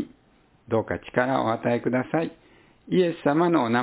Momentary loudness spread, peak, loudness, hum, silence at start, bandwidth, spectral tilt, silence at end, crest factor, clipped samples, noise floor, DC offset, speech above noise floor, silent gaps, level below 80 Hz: 7 LU; -6 dBFS; -25 LUFS; none; 0 s; 4 kHz; -11 dB/octave; 0 s; 20 dB; under 0.1%; -60 dBFS; under 0.1%; 37 dB; none; -58 dBFS